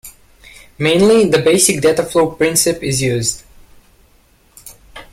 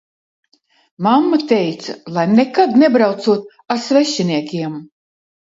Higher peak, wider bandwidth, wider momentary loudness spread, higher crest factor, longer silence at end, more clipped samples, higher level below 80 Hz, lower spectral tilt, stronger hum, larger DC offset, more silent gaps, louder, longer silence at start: about the same, 0 dBFS vs 0 dBFS; first, 16.5 kHz vs 7.8 kHz; second, 9 LU vs 12 LU; about the same, 16 dB vs 16 dB; second, 0.1 s vs 0.7 s; neither; first, -44 dBFS vs -66 dBFS; second, -4 dB/octave vs -5.5 dB/octave; neither; neither; neither; about the same, -13 LUFS vs -15 LUFS; second, 0.05 s vs 1 s